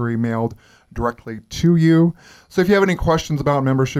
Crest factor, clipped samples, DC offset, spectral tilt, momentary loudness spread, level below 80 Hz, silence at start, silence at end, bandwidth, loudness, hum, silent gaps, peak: 16 dB; under 0.1%; under 0.1%; -7 dB/octave; 12 LU; -38 dBFS; 0 s; 0 s; 14.5 kHz; -18 LUFS; none; none; -2 dBFS